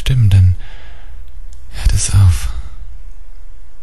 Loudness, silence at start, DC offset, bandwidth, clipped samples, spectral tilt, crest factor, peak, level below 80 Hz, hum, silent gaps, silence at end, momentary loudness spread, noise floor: -14 LUFS; 0 s; 10%; 13 kHz; under 0.1%; -4.5 dB/octave; 14 dB; -2 dBFS; -20 dBFS; none; none; 0.05 s; 25 LU; -33 dBFS